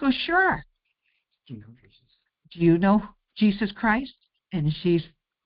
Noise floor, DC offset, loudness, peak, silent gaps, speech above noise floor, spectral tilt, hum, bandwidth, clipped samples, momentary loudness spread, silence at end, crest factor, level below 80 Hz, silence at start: -75 dBFS; under 0.1%; -24 LUFS; -8 dBFS; none; 51 dB; -5 dB/octave; none; 5.4 kHz; under 0.1%; 23 LU; 0.4 s; 16 dB; -52 dBFS; 0 s